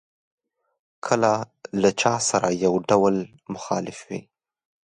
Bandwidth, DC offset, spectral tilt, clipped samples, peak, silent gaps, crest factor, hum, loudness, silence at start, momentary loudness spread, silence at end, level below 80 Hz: 11 kHz; under 0.1%; -4.5 dB/octave; under 0.1%; -4 dBFS; none; 20 dB; none; -22 LUFS; 1.05 s; 15 LU; 0.65 s; -62 dBFS